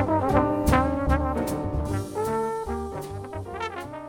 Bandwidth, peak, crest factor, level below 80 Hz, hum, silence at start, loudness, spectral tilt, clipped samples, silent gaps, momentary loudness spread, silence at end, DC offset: 17.5 kHz; -8 dBFS; 18 dB; -34 dBFS; none; 0 s; -26 LUFS; -7 dB/octave; under 0.1%; none; 12 LU; 0 s; under 0.1%